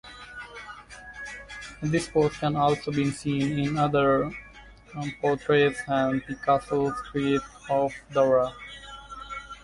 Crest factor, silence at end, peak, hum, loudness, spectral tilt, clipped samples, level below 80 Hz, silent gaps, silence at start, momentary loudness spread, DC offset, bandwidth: 18 dB; 0.05 s; -10 dBFS; none; -26 LUFS; -6 dB/octave; under 0.1%; -52 dBFS; none; 0.05 s; 18 LU; under 0.1%; 11.5 kHz